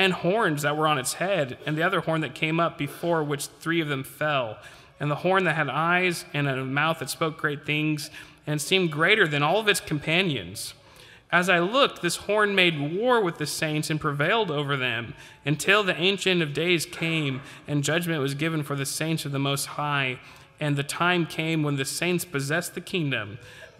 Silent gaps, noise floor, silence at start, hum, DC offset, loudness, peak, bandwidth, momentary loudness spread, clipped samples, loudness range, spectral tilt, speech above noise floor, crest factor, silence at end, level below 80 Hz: none; -51 dBFS; 0 s; none; under 0.1%; -25 LUFS; -6 dBFS; 16 kHz; 9 LU; under 0.1%; 3 LU; -4.5 dB/octave; 25 dB; 20 dB; 0.1 s; -62 dBFS